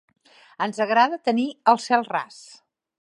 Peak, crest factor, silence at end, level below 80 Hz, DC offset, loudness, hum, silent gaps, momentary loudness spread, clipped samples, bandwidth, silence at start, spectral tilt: -4 dBFS; 20 dB; 0.75 s; -80 dBFS; under 0.1%; -22 LUFS; none; none; 10 LU; under 0.1%; 11.5 kHz; 0.6 s; -4 dB/octave